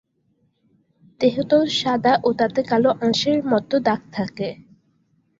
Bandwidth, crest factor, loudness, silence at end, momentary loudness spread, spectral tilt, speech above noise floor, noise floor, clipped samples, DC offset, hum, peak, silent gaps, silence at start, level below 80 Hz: 7.8 kHz; 18 dB; -20 LUFS; 0.8 s; 9 LU; -5 dB/octave; 46 dB; -66 dBFS; under 0.1%; under 0.1%; none; -4 dBFS; none; 1.2 s; -60 dBFS